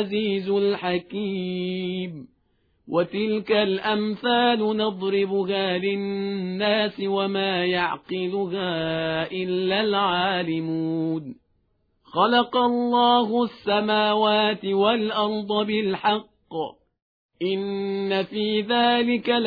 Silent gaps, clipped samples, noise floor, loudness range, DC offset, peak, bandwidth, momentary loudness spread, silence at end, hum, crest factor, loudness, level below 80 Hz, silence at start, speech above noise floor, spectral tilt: 17.02-17.29 s; under 0.1%; -68 dBFS; 5 LU; under 0.1%; -8 dBFS; 5 kHz; 8 LU; 0 s; none; 16 dB; -23 LUFS; -64 dBFS; 0 s; 45 dB; -8 dB/octave